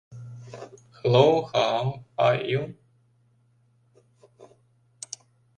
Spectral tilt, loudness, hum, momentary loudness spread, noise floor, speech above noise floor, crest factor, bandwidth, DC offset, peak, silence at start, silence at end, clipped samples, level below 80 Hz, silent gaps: -5.5 dB/octave; -23 LUFS; none; 24 LU; -64 dBFS; 41 dB; 24 dB; 10.5 kHz; under 0.1%; -4 dBFS; 0.1 s; 1.1 s; under 0.1%; -64 dBFS; none